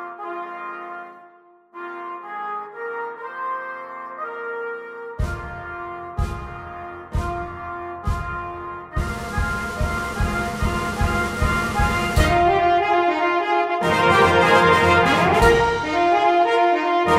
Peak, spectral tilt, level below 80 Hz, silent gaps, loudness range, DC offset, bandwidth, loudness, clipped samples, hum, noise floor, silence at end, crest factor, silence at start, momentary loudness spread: -2 dBFS; -5.5 dB/octave; -32 dBFS; none; 15 LU; under 0.1%; 16 kHz; -20 LUFS; under 0.1%; none; -51 dBFS; 0 s; 18 dB; 0 s; 18 LU